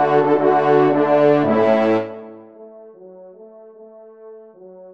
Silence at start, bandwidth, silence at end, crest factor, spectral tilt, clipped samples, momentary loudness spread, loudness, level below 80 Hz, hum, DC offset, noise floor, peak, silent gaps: 0 s; 6.4 kHz; 0.05 s; 16 dB; -8.5 dB/octave; under 0.1%; 7 LU; -15 LUFS; -68 dBFS; none; under 0.1%; -42 dBFS; -4 dBFS; none